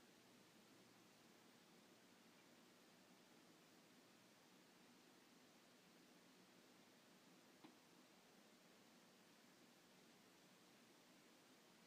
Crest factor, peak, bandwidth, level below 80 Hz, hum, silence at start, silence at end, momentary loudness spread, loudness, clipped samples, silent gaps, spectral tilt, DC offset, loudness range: 18 dB; -52 dBFS; 15.5 kHz; under -90 dBFS; none; 0 s; 0 s; 1 LU; -70 LUFS; under 0.1%; none; -3 dB/octave; under 0.1%; 0 LU